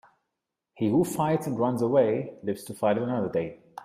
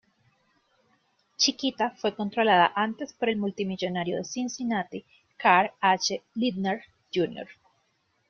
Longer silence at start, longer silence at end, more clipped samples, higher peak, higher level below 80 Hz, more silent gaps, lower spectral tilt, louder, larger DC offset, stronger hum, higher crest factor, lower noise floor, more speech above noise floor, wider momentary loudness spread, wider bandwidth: second, 0.75 s vs 1.4 s; second, 0 s vs 0.75 s; neither; second, -10 dBFS vs -6 dBFS; about the same, -66 dBFS vs -70 dBFS; neither; first, -7 dB/octave vs -3.5 dB/octave; about the same, -27 LUFS vs -26 LUFS; neither; neither; about the same, 18 dB vs 22 dB; first, -84 dBFS vs -72 dBFS; first, 59 dB vs 45 dB; about the same, 10 LU vs 11 LU; first, 15.5 kHz vs 7.2 kHz